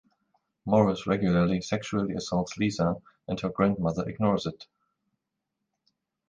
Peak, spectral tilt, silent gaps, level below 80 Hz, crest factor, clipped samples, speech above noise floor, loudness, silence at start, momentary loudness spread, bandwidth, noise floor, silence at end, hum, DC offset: -8 dBFS; -6.5 dB/octave; none; -54 dBFS; 22 dB; under 0.1%; 57 dB; -28 LUFS; 0.65 s; 9 LU; 9.2 kHz; -84 dBFS; 1.65 s; none; under 0.1%